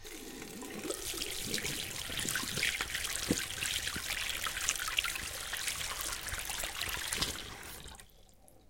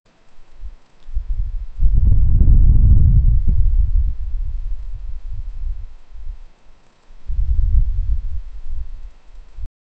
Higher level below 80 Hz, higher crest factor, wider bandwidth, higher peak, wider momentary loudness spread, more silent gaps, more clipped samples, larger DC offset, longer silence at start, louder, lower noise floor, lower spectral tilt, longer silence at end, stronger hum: second, -54 dBFS vs -16 dBFS; first, 28 dB vs 14 dB; first, 17 kHz vs 1.1 kHz; second, -10 dBFS vs -2 dBFS; second, 12 LU vs 25 LU; neither; neither; neither; second, 0 s vs 0.3 s; second, -35 LUFS vs -19 LUFS; first, -60 dBFS vs -44 dBFS; second, -1 dB/octave vs -11 dB/octave; second, 0.05 s vs 0.35 s; neither